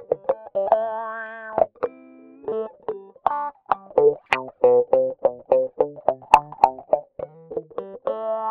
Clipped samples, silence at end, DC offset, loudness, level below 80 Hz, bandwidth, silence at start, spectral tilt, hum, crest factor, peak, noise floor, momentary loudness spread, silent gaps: under 0.1%; 0 s; under 0.1%; -23 LUFS; -60 dBFS; 8.4 kHz; 0 s; -5 dB/octave; none; 22 dB; 0 dBFS; -46 dBFS; 14 LU; none